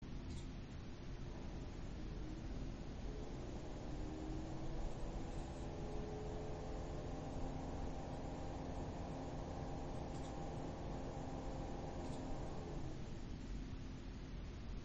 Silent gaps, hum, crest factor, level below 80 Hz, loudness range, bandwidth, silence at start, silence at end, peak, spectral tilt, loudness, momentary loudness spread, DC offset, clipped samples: none; none; 14 dB; -50 dBFS; 2 LU; 8.4 kHz; 0 s; 0 s; -32 dBFS; -6.5 dB/octave; -49 LUFS; 4 LU; under 0.1%; under 0.1%